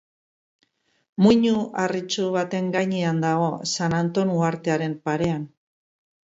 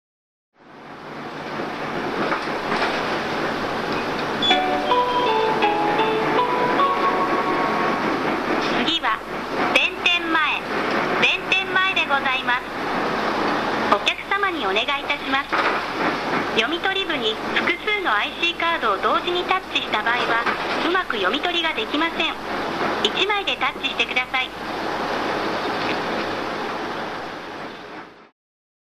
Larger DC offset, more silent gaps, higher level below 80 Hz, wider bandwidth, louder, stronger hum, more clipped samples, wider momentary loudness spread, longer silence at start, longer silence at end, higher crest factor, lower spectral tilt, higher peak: neither; neither; second, -60 dBFS vs -52 dBFS; second, 8 kHz vs 14 kHz; about the same, -23 LUFS vs -21 LUFS; neither; neither; about the same, 7 LU vs 8 LU; first, 1.2 s vs 0.65 s; first, 0.9 s vs 0.6 s; about the same, 18 dB vs 20 dB; first, -5.5 dB/octave vs -3.5 dB/octave; about the same, -4 dBFS vs -2 dBFS